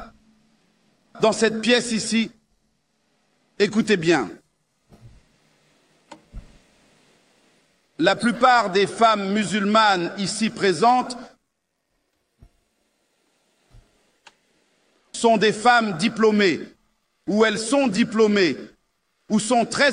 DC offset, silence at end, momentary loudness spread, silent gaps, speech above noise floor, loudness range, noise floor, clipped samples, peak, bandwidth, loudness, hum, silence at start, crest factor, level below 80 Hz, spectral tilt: under 0.1%; 0 s; 8 LU; none; 56 dB; 7 LU; -75 dBFS; under 0.1%; -2 dBFS; 10.5 kHz; -20 LUFS; none; 0 s; 22 dB; -58 dBFS; -4 dB/octave